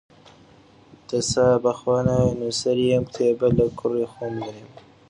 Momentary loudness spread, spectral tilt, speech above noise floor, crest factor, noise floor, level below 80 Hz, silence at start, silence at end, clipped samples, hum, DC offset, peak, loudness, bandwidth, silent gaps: 10 LU; -5.5 dB/octave; 30 dB; 18 dB; -52 dBFS; -46 dBFS; 1.1 s; 0.45 s; under 0.1%; none; under 0.1%; -6 dBFS; -22 LUFS; 10.5 kHz; none